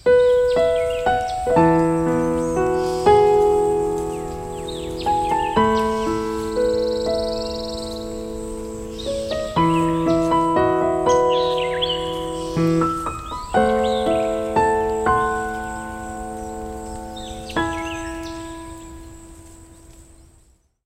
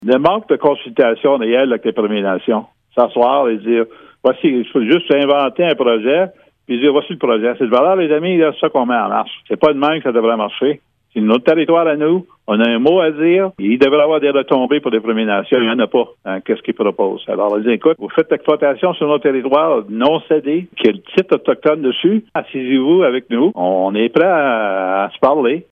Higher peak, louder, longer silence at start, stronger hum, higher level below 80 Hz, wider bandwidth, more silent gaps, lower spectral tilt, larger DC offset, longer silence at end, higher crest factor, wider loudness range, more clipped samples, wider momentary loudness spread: about the same, -2 dBFS vs 0 dBFS; second, -20 LUFS vs -15 LUFS; about the same, 0.05 s vs 0 s; neither; first, -38 dBFS vs -60 dBFS; first, 16 kHz vs 5 kHz; neither; second, -5.5 dB/octave vs -8 dB/octave; neither; first, 0.85 s vs 0.1 s; about the same, 18 dB vs 14 dB; first, 11 LU vs 2 LU; neither; first, 14 LU vs 6 LU